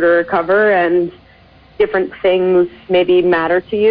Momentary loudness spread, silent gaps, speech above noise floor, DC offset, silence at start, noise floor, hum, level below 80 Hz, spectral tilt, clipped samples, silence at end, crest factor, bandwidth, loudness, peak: 5 LU; none; 32 dB; under 0.1%; 0 s; -45 dBFS; none; -48 dBFS; -9 dB/octave; under 0.1%; 0 s; 12 dB; 5 kHz; -14 LUFS; -2 dBFS